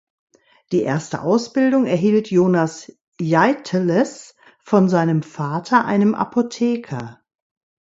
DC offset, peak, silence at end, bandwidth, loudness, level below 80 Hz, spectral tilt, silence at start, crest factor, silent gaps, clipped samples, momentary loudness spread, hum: under 0.1%; 0 dBFS; 0.7 s; 8 kHz; -19 LUFS; -62 dBFS; -7 dB/octave; 0.7 s; 18 dB; 3.01-3.12 s; under 0.1%; 9 LU; none